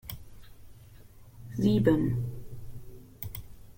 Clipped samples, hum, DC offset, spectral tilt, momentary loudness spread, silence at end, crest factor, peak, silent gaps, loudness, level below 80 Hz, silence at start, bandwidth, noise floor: under 0.1%; none; under 0.1%; -8 dB/octave; 24 LU; 0.05 s; 22 dB; -10 dBFS; none; -29 LUFS; -50 dBFS; 0.05 s; 16.5 kHz; -51 dBFS